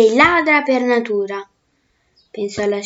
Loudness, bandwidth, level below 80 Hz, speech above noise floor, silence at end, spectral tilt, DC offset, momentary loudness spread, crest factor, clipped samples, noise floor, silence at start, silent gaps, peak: -16 LUFS; 8 kHz; -56 dBFS; 48 dB; 0 s; -4.5 dB/octave; under 0.1%; 16 LU; 16 dB; under 0.1%; -64 dBFS; 0 s; none; 0 dBFS